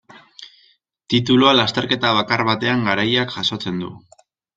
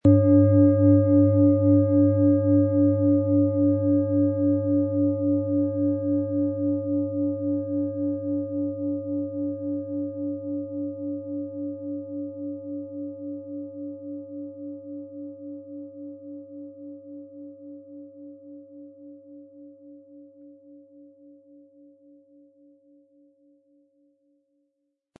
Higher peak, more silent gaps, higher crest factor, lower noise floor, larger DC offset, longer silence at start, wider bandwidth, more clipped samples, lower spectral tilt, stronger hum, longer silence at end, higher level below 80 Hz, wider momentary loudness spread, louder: first, -2 dBFS vs -6 dBFS; neither; about the same, 18 dB vs 18 dB; second, -58 dBFS vs -77 dBFS; neither; first, 0.4 s vs 0.05 s; first, 7.8 kHz vs 1.7 kHz; neither; second, -5 dB/octave vs -14.5 dB/octave; neither; second, 0.6 s vs 4.45 s; first, -54 dBFS vs -64 dBFS; second, 12 LU vs 24 LU; first, -17 LUFS vs -23 LUFS